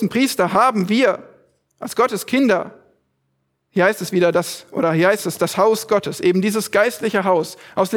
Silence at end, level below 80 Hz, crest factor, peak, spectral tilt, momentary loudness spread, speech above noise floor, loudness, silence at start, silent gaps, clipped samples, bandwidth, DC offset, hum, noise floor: 0 s; -64 dBFS; 16 dB; -2 dBFS; -5 dB/octave; 8 LU; 52 dB; -18 LUFS; 0 s; none; under 0.1%; 20 kHz; under 0.1%; none; -70 dBFS